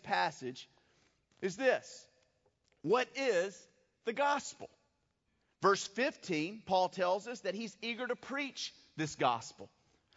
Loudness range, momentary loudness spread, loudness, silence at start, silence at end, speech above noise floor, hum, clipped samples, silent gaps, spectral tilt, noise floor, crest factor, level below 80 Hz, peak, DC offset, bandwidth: 2 LU; 14 LU; -35 LUFS; 0.05 s; 0.5 s; 44 dB; none; under 0.1%; none; -2.5 dB/octave; -80 dBFS; 22 dB; -80 dBFS; -14 dBFS; under 0.1%; 7.6 kHz